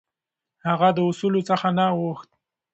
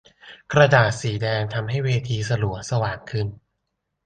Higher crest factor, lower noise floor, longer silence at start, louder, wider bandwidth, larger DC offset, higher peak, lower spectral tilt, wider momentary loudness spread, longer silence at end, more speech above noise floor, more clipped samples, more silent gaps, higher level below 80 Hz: about the same, 18 dB vs 20 dB; first, -87 dBFS vs -77 dBFS; first, 0.65 s vs 0.25 s; about the same, -22 LUFS vs -22 LUFS; second, 8.2 kHz vs 9.4 kHz; neither; second, -6 dBFS vs -2 dBFS; first, -7 dB/octave vs -5.5 dB/octave; about the same, 11 LU vs 12 LU; second, 0.5 s vs 0.7 s; first, 65 dB vs 56 dB; neither; neither; second, -68 dBFS vs -48 dBFS